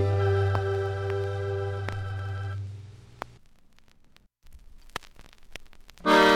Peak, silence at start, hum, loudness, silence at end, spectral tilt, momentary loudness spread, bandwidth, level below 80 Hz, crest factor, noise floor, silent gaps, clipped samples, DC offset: -8 dBFS; 0 s; none; -29 LUFS; 0 s; -6 dB/octave; 22 LU; 14.5 kHz; -52 dBFS; 20 dB; -58 dBFS; none; under 0.1%; under 0.1%